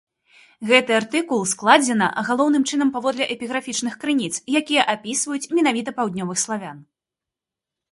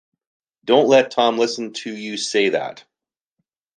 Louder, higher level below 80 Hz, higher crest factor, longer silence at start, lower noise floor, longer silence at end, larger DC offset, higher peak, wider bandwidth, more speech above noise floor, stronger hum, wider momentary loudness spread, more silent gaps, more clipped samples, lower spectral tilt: about the same, -20 LUFS vs -19 LUFS; about the same, -68 dBFS vs -72 dBFS; about the same, 22 dB vs 18 dB; about the same, 0.6 s vs 0.65 s; about the same, -87 dBFS vs -88 dBFS; first, 1.1 s vs 0.95 s; neither; about the same, 0 dBFS vs -2 dBFS; first, 11.5 kHz vs 9.8 kHz; about the same, 67 dB vs 69 dB; neither; second, 9 LU vs 15 LU; neither; neither; about the same, -3 dB/octave vs -3.5 dB/octave